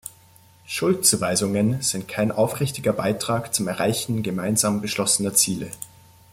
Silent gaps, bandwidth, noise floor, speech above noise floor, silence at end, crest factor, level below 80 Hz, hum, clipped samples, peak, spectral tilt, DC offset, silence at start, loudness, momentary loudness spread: none; 16.5 kHz; -53 dBFS; 30 dB; 0.45 s; 20 dB; -58 dBFS; none; under 0.1%; -4 dBFS; -3.5 dB/octave; under 0.1%; 0.05 s; -22 LUFS; 10 LU